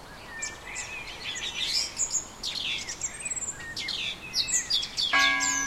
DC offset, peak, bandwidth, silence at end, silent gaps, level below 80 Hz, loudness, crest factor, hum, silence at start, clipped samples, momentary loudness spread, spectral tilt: under 0.1%; -10 dBFS; 16.5 kHz; 0 s; none; -54 dBFS; -28 LUFS; 20 dB; none; 0 s; under 0.1%; 13 LU; 1 dB/octave